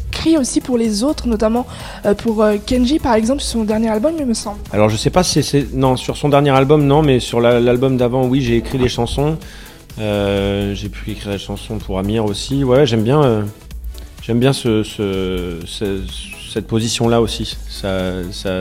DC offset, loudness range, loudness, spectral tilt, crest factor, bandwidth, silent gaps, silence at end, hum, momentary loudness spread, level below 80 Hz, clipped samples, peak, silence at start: under 0.1%; 6 LU; -16 LUFS; -5.5 dB/octave; 16 dB; 16.5 kHz; none; 0 s; none; 12 LU; -32 dBFS; under 0.1%; 0 dBFS; 0 s